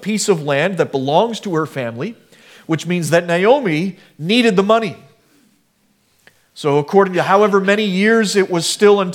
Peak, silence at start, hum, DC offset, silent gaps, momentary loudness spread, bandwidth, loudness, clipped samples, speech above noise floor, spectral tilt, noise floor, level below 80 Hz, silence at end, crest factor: 0 dBFS; 0 s; none; under 0.1%; none; 10 LU; 16.5 kHz; -15 LUFS; under 0.1%; 45 dB; -5 dB/octave; -60 dBFS; -66 dBFS; 0 s; 16 dB